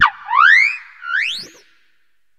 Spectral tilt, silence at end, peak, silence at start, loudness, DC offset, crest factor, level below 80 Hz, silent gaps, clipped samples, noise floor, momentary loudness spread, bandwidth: 1 dB/octave; 0.95 s; 0 dBFS; 0 s; -13 LUFS; under 0.1%; 18 dB; -62 dBFS; none; under 0.1%; -67 dBFS; 16 LU; 14 kHz